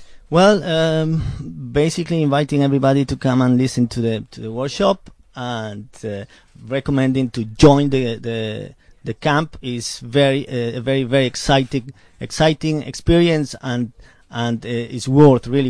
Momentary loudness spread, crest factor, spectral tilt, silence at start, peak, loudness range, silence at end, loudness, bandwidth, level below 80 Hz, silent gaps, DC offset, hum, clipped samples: 16 LU; 18 dB; -6 dB/octave; 0 s; 0 dBFS; 4 LU; 0 s; -18 LUFS; 11 kHz; -38 dBFS; none; under 0.1%; none; under 0.1%